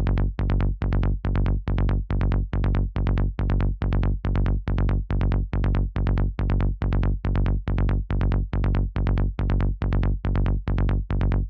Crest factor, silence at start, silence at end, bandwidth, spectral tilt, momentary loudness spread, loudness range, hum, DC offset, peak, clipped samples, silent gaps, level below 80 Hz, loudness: 14 dB; 0 s; 0 s; 4.8 kHz; -10 dB/octave; 1 LU; 0 LU; none; under 0.1%; -8 dBFS; under 0.1%; none; -24 dBFS; -25 LUFS